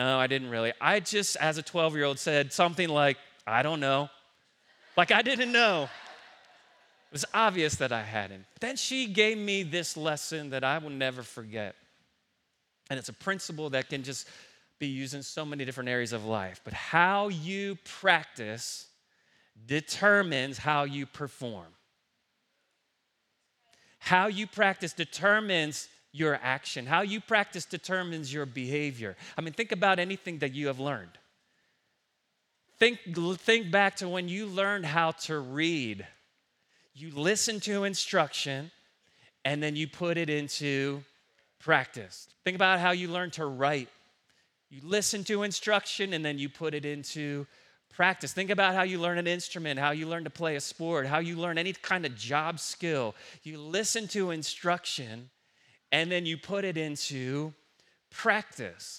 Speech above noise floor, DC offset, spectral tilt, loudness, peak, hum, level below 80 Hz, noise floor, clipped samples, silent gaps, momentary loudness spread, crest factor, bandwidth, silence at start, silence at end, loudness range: 48 dB; under 0.1%; -3.5 dB/octave; -29 LUFS; -6 dBFS; none; -74 dBFS; -78 dBFS; under 0.1%; none; 13 LU; 26 dB; 16 kHz; 0 s; 0 s; 7 LU